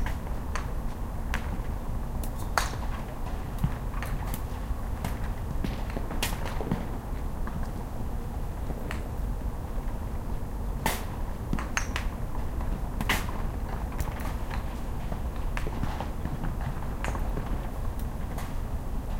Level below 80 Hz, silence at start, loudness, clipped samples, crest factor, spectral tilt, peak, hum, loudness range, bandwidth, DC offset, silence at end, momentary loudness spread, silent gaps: -32 dBFS; 0 s; -34 LUFS; under 0.1%; 28 dB; -5 dB/octave; -4 dBFS; none; 2 LU; 17 kHz; under 0.1%; 0 s; 6 LU; none